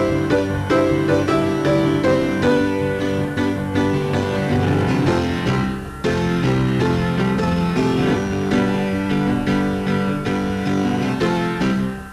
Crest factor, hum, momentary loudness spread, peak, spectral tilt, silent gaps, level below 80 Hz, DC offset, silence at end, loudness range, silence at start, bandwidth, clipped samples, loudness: 14 dB; none; 4 LU; -4 dBFS; -7 dB/octave; none; -38 dBFS; under 0.1%; 0 s; 2 LU; 0 s; 13.5 kHz; under 0.1%; -19 LUFS